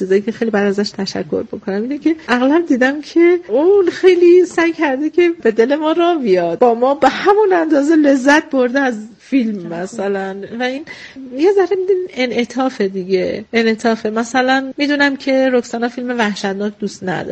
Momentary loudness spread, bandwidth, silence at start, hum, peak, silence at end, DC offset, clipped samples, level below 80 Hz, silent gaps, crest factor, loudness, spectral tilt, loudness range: 10 LU; 8.8 kHz; 0 s; none; 0 dBFS; 0 s; under 0.1%; under 0.1%; -58 dBFS; none; 14 dB; -15 LUFS; -5 dB/octave; 5 LU